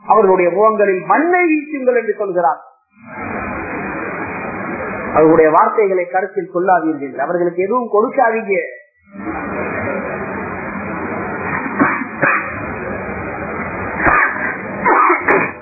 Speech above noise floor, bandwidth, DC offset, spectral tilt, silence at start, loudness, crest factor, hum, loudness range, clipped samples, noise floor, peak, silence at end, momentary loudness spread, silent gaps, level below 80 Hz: 22 dB; 2.7 kHz; under 0.1%; -12 dB/octave; 0.05 s; -16 LUFS; 16 dB; none; 6 LU; under 0.1%; -36 dBFS; 0 dBFS; 0 s; 12 LU; none; -44 dBFS